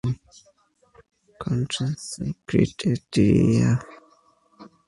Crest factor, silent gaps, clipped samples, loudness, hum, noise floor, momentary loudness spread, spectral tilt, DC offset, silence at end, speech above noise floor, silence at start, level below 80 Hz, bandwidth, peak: 20 dB; none; under 0.1%; -23 LUFS; none; -62 dBFS; 13 LU; -6.5 dB/octave; under 0.1%; 0.2 s; 40 dB; 0.05 s; -48 dBFS; 11.5 kHz; -4 dBFS